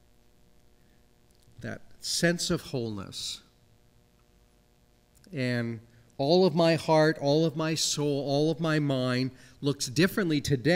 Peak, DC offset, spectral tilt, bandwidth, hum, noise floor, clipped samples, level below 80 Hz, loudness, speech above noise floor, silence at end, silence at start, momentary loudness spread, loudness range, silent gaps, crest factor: -10 dBFS; under 0.1%; -5 dB/octave; 16 kHz; none; -63 dBFS; under 0.1%; -60 dBFS; -27 LUFS; 36 dB; 0 s; 1.6 s; 14 LU; 11 LU; none; 20 dB